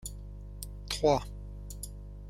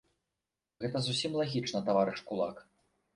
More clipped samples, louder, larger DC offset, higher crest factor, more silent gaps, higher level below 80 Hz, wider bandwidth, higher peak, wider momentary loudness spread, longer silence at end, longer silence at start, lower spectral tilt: neither; about the same, -33 LUFS vs -33 LUFS; neither; about the same, 20 dB vs 20 dB; neither; first, -44 dBFS vs -70 dBFS; first, 16 kHz vs 11.5 kHz; about the same, -14 dBFS vs -16 dBFS; first, 18 LU vs 7 LU; second, 0 s vs 0.55 s; second, 0 s vs 0.8 s; about the same, -4.5 dB/octave vs -5 dB/octave